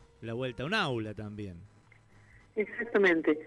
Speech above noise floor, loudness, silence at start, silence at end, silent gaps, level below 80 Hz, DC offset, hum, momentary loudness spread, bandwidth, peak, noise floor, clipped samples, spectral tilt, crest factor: 28 dB; -31 LUFS; 0.2 s; 0 s; none; -62 dBFS; under 0.1%; none; 17 LU; 11.5 kHz; -14 dBFS; -59 dBFS; under 0.1%; -6 dB/octave; 18 dB